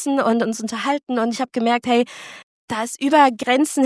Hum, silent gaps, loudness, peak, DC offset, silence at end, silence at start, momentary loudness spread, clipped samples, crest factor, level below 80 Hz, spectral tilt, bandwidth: none; 2.43-2.68 s; -19 LUFS; -2 dBFS; under 0.1%; 0 s; 0 s; 12 LU; under 0.1%; 18 dB; -66 dBFS; -3.5 dB/octave; 11 kHz